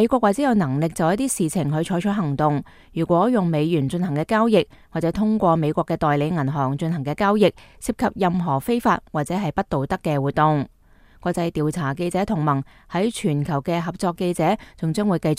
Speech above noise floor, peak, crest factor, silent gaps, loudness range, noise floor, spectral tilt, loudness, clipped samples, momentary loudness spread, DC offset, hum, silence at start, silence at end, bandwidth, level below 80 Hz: 31 dB; -2 dBFS; 18 dB; none; 3 LU; -51 dBFS; -6.5 dB/octave; -22 LUFS; under 0.1%; 7 LU; under 0.1%; none; 0 s; 0 s; 15.5 kHz; -48 dBFS